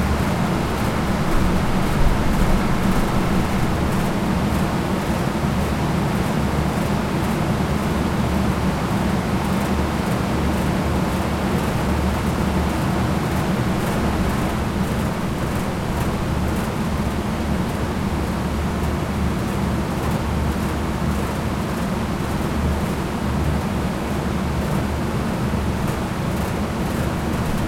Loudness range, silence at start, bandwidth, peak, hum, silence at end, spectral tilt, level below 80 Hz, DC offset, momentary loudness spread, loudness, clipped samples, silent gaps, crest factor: 2 LU; 0 s; 16.5 kHz; -6 dBFS; none; 0 s; -6.5 dB/octave; -28 dBFS; under 0.1%; 3 LU; -22 LUFS; under 0.1%; none; 16 dB